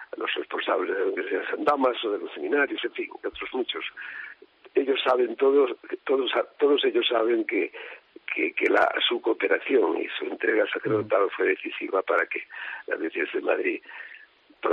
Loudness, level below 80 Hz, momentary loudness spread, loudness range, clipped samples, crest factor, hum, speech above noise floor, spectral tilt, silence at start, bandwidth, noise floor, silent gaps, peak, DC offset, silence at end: -26 LUFS; -70 dBFS; 12 LU; 4 LU; under 0.1%; 16 dB; none; 27 dB; -1 dB/octave; 0 s; 5.4 kHz; -52 dBFS; none; -8 dBFS; under 0.1%; 0 s